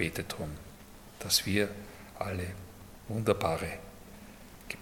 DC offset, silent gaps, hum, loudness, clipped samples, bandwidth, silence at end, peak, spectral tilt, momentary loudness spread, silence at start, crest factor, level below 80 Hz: under 0.1%; none; none; -33 LUFS; under 0.1%; 17.5 kHz; 0 s; -12 dBFS; -3.5 dB/octave; 23 LU; 0 s; 24 dB; -56 dBFS